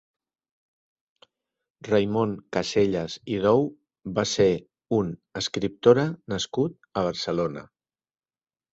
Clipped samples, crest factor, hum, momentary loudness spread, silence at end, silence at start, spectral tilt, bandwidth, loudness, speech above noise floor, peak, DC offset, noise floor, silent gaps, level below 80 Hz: under 0.1%; 22 dB; none; 9 LU; 1.1 s; 1.85 s; -5.5 dB/octave; 8 kHz; -25 LUFS; over 66 dB; -4 dBFS; under 0.1%; under -90 dBFS; none; -56 dBFS